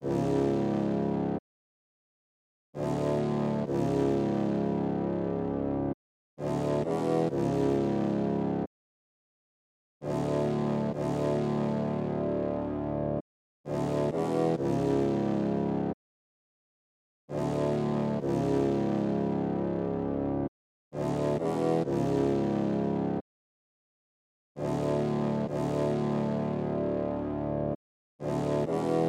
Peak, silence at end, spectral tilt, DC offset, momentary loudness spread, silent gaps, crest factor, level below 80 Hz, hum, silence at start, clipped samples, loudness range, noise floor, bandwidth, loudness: -14 dBFS; 0 s; -8.5 dB/octave; under 0.1%; 7 LU; 1.39-2.73 s, 5.94-6.37 s, 8.67-10.00 s, 13.21-13.64 s, 15.94-17.28 s, 20.48-20.91 s, 23.21-24.55 s, 27.75-28.19 s; 16 dB; -54 dBFS; none; 0 s; under 0.1%; 2 LU; under -90 dBFS; 11 kHz; -30 LUFS